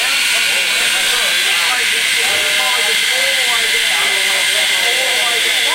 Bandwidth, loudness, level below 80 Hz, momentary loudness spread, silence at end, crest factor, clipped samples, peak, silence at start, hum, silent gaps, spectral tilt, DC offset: 16 kHz; -12 LUFS; -52 dBFS; 0 LU; 0 s; 14 dB; under 0.1%; 0 dBFS; 0 s; none; none; 2 dB/octave; under 0.1%